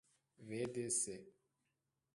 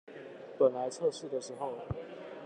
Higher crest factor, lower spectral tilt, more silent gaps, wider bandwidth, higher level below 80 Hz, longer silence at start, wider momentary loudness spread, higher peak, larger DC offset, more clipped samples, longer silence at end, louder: about the same, 20 dB vs 20 dB; second, -3.5 dB/octave vs -5.5 dB/octave; neither; about the same, 11.5 kHz vs 10.5 kHz; second, -80 dBFS vs -62 dBFS; first, 0.4 s vs 0.05 s; about the same, 17 LU vs 18 LU; second, -26 dBFS vs -14 dBFS; neither; neither; first, 0.85 s vs 0 s; second, -41 LUFS vs -34 LUFS